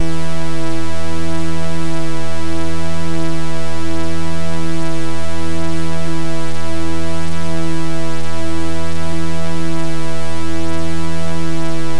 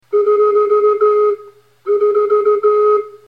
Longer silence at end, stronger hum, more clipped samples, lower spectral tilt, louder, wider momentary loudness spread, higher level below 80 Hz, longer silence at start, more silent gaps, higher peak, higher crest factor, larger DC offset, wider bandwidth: about the same, 0 s vs 0.1 s; neither; neither; about the same, -5.5 dB/octave vs -6.5 dB/octave; second, -23 LUFS vs -13 LUFS; second, 2 LU vs 6 LU; first, -38 dBFS vs -76 dBFS; about the same, 0 s vs 0.1 s; neither; about the same, -4 dBFS vs -6 dBFS; first, 16 dB vs 8 dB; first, 50% vs 0.1%; first, 11.5 kHz vs 4.2 kHz